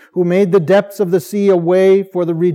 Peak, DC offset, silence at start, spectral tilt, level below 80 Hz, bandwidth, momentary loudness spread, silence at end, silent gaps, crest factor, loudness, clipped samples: -2 dBFS; under 0.1%; 0.15 s; -7.5 dB/octave; -76 dBFS; 15.5 kHz; 5 LU; 0 s; none; 12 dB; -13 LUFS; under 0.1%